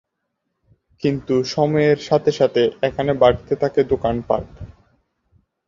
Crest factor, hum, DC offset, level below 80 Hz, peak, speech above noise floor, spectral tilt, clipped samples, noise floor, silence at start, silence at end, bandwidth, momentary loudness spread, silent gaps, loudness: 18 dB; none; under 0.1%; -44 dBFS; -2 dBFS; 57 dB; -6.5 dB/octave; under 0.1%; -76 dBFS; 1 s; 0.95 s; 7.6 kHz; 7 LU; none; -19 LUFS